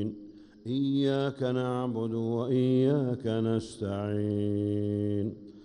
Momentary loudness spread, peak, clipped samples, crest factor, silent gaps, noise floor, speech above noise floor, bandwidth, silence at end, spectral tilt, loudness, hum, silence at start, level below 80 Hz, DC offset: 9 LU; -16 dBFS; under 0.1%; 14 dB; none; -49 dBFS; 20 dB; 10.5 kHz; 0 s; -8 dB/octave; -30 LUFS; none; 0 s; -66 dBFS; under 0.1%